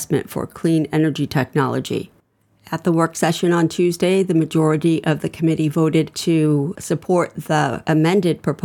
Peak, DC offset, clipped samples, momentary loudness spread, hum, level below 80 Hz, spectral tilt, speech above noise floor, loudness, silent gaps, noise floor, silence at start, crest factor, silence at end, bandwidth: -4 dBFS; under 0.1%; under 0.1%; 6 LU; none; -56 dBFS; -6.5 dB/octave; 41 dB; -19 LUFS; none; -59 dBFS; 0 s; 16 dB; 0.1 s; 17.5 kHz